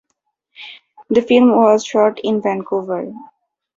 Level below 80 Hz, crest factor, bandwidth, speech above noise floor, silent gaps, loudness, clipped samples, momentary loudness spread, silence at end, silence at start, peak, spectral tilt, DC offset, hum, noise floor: -60 dBFS; 16 dB; 7.6 kHz; 57 dB; none; -15 LUFS; under 0.1%; 24 LU; 0.5 s; 0.6 s; -2 dBFS; -5.5 dB/octave; under 0.1%; none; -72 dBFS